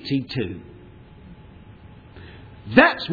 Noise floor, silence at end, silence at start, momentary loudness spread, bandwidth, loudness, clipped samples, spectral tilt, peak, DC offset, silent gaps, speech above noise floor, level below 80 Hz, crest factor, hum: -45 dBFS; 0 s; 0 s; 28 LU; 4.9 kHz; -19 LUFS; under 0.1%; -7.5 dB/octave; 0 dBFS; under 0.1%; none; 25 dB; -50 dBFS; 24 dB; none